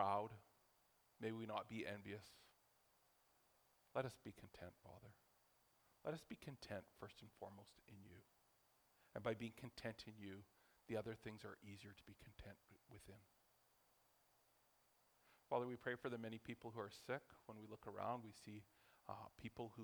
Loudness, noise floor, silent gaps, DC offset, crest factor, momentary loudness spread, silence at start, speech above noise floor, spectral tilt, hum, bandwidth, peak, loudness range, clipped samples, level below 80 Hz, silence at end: -52 LUFS; -79 dBFS; none; under 0.1%; 26 dB; 17 LU; 0 s; 27 dB; -6 dB/octave; none; over 20 kHz; -26 dBFS; 7 LU; under 0.1%; -80 dBFS; 0 s